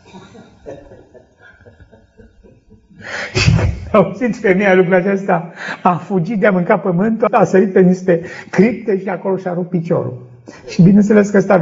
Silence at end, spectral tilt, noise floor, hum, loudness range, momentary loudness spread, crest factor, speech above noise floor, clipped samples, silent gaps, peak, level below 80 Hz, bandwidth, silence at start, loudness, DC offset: 0 s; -7 dB/octave; -46 dBFS; none; 5 LU; 13 LU; 14 dB; 33 dB; under 0.1%; none; 0 dBFS; -36 dBFS; 7.8 kHz; 0.15 s; -14 LUFS; under 0.1%